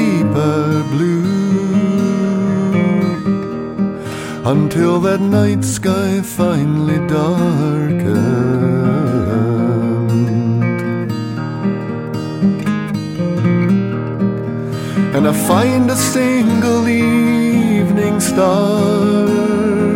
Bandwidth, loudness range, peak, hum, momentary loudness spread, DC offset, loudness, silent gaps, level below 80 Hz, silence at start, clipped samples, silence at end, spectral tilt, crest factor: 17 kHz; 4 LU; -2 dBFS; none; 7 LU; under 0.1%; -15 LUFS; none; -48 dBFS; 0 s; under 0.1%; 0 s; -6.5 dB/octave; 12 dB